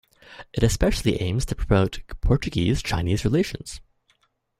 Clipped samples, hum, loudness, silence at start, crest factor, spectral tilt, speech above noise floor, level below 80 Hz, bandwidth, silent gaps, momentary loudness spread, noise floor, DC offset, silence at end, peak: under 0.1%; none; -24 LUFS; 0.3 s; 20 dB; -6 dB/octave; 44 dB; -32 dBFS; 15.5 kHz; none; 13 LU; -67 dBFS; under 0.1%; 0.8 s; -4 dBFS